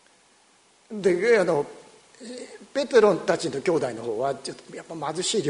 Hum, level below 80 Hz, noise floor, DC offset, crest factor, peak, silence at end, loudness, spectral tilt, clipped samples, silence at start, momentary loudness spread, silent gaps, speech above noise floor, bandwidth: none; -68 dBFS; -59 dBFS; under 0.1%; 20 dB; -6 dBFS; 0 s; -24 LUFS; -4 dB/octave; under 0.1%; 0.9 s; 20 LU; none; 35 dB; 11 kHz